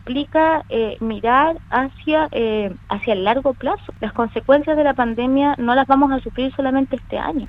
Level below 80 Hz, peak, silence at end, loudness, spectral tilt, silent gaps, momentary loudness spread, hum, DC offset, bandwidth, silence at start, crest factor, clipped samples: -42 dBFS; -2 dBFS; 0 s; -19 LUFS; -8 dB/octave; none; 8 LU; none; under 0.1%; 5.2 kHz; 0.05 s; 18 dB; under 0.1%